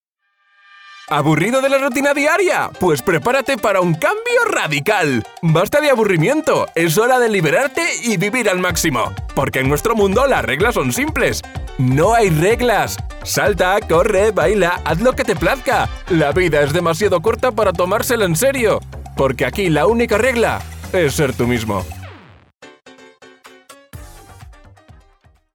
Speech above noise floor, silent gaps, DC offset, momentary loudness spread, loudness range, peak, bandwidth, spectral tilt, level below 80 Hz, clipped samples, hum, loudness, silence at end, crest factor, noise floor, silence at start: 48 dB; 22.56-22.61 s; under 0.1%; 5 LU; 3 LU; -2 dBFS; over 20 kHz; -5 dB/octave; -36 dBFS; under 0.1%; none; -16 LUFS; 1 s; 14 dB; -64 dBFS; 0.85 s